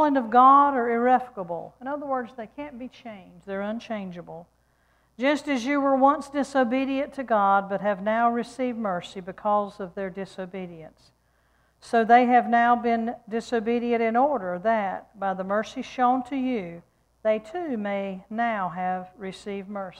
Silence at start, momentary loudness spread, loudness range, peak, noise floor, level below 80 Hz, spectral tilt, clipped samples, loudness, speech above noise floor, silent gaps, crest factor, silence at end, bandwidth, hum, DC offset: 0 s; 18 LU; 9 LU; -6 dBFS; -65 dBFS; -64 dBFS; -6 dB/octave; under 0.1%; -24 LUFS; 41 dB; none; 20 dB; 0 s; 10.5 kHz; none; under 0.1%